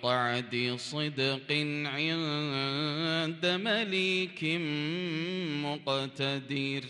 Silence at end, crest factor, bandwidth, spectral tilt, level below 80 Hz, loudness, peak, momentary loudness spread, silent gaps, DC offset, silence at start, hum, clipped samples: 0 s; 18 dB; 11.5 kHz; -5 dB/octave; -76 dBFS; -31 LUFS; -14 dBFS; 5 LU; none; under 0.1%; 0 s; none; under 0.1%